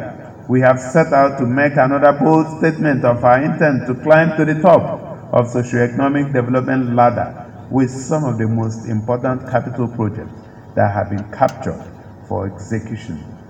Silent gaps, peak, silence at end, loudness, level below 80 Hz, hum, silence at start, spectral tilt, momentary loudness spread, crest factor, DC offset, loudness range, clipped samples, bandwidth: none; 0 dBFS; 0 s; -16 LUFS; -50 dBFS; none; 0 s; -8 dB/octave; 14 LU; 16 dB; under 0.1%; 7 LU; under 0.1%; 9.2 kHz